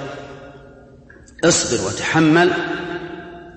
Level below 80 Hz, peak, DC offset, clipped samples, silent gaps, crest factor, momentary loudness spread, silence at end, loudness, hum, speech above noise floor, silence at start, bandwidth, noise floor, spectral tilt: -48 dBFS; -2 dBFS; under 0.1%; under 0.1%; none; 18 dB; 21 LU; 0 s; -17 LUFS; none; 28 dB; 0 s; 8.8 kHz; -44 dBFS; -4 dB/octave